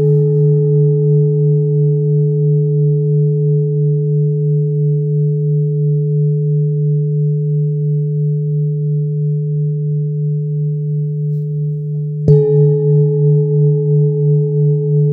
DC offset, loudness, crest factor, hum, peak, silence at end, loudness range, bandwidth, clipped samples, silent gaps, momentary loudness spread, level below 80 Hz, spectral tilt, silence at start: under 0.1%; -14 LUFS; 14 dB; none; 0 dBFS; 0 s; 4 LU; 0.9 kHz; under 0.1%; none; 6 LU; -52 dBFS; -15 dB/octave; 0 s